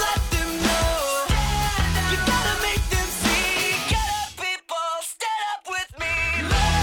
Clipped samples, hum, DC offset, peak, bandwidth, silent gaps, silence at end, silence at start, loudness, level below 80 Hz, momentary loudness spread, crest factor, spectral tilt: under 0.1%; none; under 0.1%; -8 dBFS; 19.5 kHz; none; 0 s; 0 s; -23 LUFS; -30 dBFS; 6 LU; 16 dB; -3 dB/octave